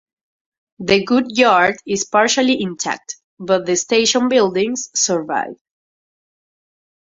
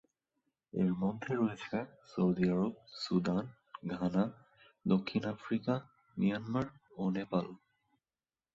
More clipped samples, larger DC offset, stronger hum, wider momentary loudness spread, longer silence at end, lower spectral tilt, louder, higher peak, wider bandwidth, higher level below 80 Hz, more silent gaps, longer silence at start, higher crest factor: neither; neither; neither; about the same, 10 LU vs 11 LU; first, 1.45 s vs 1 s; second, -2.5 dB/octave vs -8 dB/octave; first, -16 LUFS vs -35 LUFS; first, 0 dBFS vs -18 dBFS; about the same, 8 kHz vs 7.6 kHz; first, -58 dBFS vs -66 dBFS; first, 3.24-3.37 s vs none; about the same, 0.8 s vs 0.75 s; about the same, 18 dB vs 18 dB